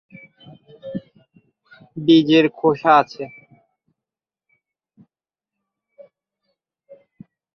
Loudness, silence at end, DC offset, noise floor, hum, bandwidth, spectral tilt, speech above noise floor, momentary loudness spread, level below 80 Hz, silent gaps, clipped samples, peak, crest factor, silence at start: -16 LUFS; 4.3 s; under 0.1%; -89 dBFS; none; 6.4 kHz; -7 dB/octave; 74 dB; 22 LU; -68 dBFS; none; under 0.1%; -2 dBFS; 22 dB; 0.85 s